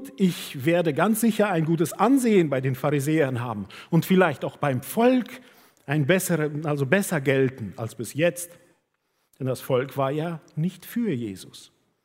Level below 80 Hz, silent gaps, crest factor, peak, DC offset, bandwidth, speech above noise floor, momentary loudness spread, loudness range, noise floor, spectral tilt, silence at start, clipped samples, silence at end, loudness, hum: -68 dBFS; none; 20 dB; -4 dBFS; under 0.1%; 16 kHz; 50 dB; 13 LU; 6 LU; -73 dBFS; -6 dB/octave; 0 s; under 0.1%; 0.4 s; -24 LUFS; none